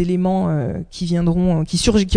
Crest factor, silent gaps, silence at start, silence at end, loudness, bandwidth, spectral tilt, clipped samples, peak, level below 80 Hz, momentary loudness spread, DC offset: 18 dB; none; 0 s; 0 s; -19 LUFS; 10 kHz; -6 dB/octave; under 0.1%; 0 dBFS; -34 dBFS; 7 LU; under 0.1%